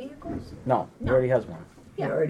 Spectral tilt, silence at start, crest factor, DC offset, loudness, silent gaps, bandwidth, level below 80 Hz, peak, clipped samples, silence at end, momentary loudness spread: -8.5 dB/octave; 0 s; 18 dB; under 0.1%; -27 LUFS; none; 10.5 kHz; -48 dBFS; -8 dBFS; under 0.1%; 0 s; 18 LU